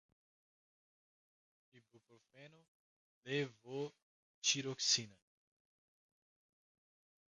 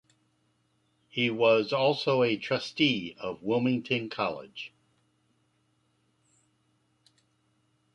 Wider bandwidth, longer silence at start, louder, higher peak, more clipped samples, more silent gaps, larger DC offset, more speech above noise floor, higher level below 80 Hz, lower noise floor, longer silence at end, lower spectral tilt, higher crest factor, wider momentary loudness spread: about the same, 10.5 kHz vs 10.5 kHz; first, 1.75 s vs 1.15 s; second, -38 LUFS vs -28 LUFS; second, -20 dBFS vs -10 dBFS; neither; first, 2.68-3.23 s, 4.02-4.42 s vs none; neither; first, over 49 dB vs 44 dB; second, -90 dBFS vs -72 dBFS; first, under -90 dBFS vs -72 dBFS; second, 2.2 s vs 3.3 s; second, -2 dB/octave vs -6 dB/octave; about the same, 26 dB vs 22 dB; about the same, 15 LU vs 14 LU